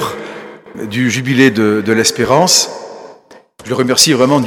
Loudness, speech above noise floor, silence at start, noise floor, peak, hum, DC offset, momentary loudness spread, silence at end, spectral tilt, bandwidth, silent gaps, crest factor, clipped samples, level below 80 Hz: -12 LUFS; 29 dB; 0 s; -41 dBFS; 0 dBFS; none; under 0.1%; 20 LU; 0 s; -3.5 dB/octave; 19.5 kHz; none; 14 dB; 0.2%; -52 dBFS